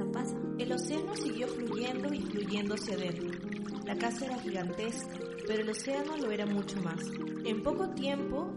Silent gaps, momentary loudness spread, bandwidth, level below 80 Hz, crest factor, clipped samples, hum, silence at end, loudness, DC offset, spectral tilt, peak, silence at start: none; 5 LU; 11.5 kHz; -62 dBFS; 16 dB; under 0.1%; none; 0 s; -35 LUFS; under 0.1%; -5 dB/octave; -18 dBFS; 0 s